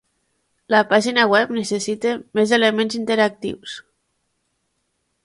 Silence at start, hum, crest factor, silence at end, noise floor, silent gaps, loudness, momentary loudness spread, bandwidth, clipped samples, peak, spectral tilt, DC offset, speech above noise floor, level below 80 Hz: 0.7 s; none; 20 dB; 1.45 s; -71 dBFS; none; -18 LUFS; 14 LU; 11.5 kHz; under 0.1%; 0 dBFS; -3.5 dB/octave; under 0.1%; 53 dB; -64 dBFS